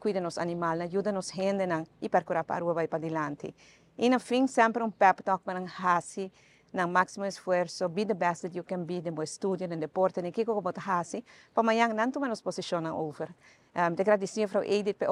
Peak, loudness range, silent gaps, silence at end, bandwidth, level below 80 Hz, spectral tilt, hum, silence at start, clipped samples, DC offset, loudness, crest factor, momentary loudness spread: -8 dBFS; 3 LU; none; 0 s; 12 kHz; -74 dBFS; -5.5 dB/octave; none; 0 s; under 0.1%; under 0.1%; -30 LUFS; 22 dB; 10 LU